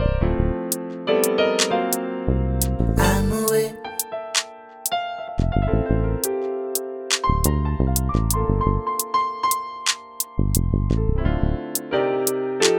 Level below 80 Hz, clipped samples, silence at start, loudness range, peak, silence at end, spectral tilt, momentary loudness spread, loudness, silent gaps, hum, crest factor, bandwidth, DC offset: -28 dBFS; under 0.1%; 0 s; 2 LU; -2 dBFS; 0 s; -4.5 dB/octave; 7 LU; -22 LUFS; none; none; 18 dB; over 20 kHz; under 0.1%